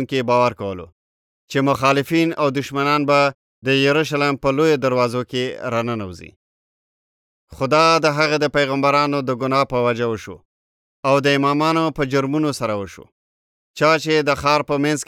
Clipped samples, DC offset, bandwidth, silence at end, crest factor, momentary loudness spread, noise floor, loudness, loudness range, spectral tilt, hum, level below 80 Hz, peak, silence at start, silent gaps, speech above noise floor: under 0.1%; under 0.1%; 16.5 kHz; 0.05 s; 16 dB; 10 LU; under -90 dBFS; -18 LUFS; 3 LU; -5 dB/octave; none; -52 dBFS; -2 dBFS; 0 s; 0.92-1.48 s, 3.34-3.62 s, 6.36-7.48 s, 10.45-11.03 s, 13.12-13.74 s; over 72 dB